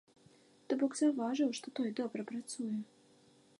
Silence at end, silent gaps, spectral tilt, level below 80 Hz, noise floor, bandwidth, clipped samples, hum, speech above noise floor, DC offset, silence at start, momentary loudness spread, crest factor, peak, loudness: 0.75 s; none; -4.5 dB/octave; -90 dBFS; -66 dBFS; 11.5 kHz; under 0.1%; none; 30 dB; under 0.1%; 0.7 s; 10 LU; 16 dB; -20 dBFS; -36 LUFS